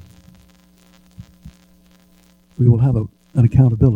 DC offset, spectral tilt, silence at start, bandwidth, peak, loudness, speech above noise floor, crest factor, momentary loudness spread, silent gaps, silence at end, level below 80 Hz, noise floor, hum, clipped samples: under 0.1%; -11 dB/octave; 1.2 s; 2.9 kHz; 0 dBFS; -16 LUFS; 40 dB; 18 dB; 10 LU; none; 0 s; -38 dBFS; -53 dBFS; none; under 0.1%